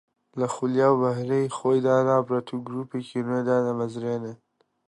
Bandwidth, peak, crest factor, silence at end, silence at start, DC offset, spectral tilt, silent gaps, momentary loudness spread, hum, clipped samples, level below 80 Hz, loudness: 11 kHz; -8 dBFS; 16 dB; 0.55 s; 0.35 s; under 0.1%; -7 dB/octave; none; 11 LU; none; under 0.1%; -72 dBFS; -25 LUFS